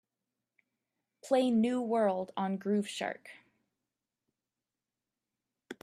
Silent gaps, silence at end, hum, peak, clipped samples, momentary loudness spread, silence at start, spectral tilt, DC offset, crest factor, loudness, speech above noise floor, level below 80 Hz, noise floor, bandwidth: none; 0.1 s; none; -16 dBFS; under 0.1%; 11 LU; 1.25 s; -6 dB/octave; under 0.1%; 18 dB; -32 LUFS; over 59 dB; -84 dBFS; under -90 dBFS; 13 kHz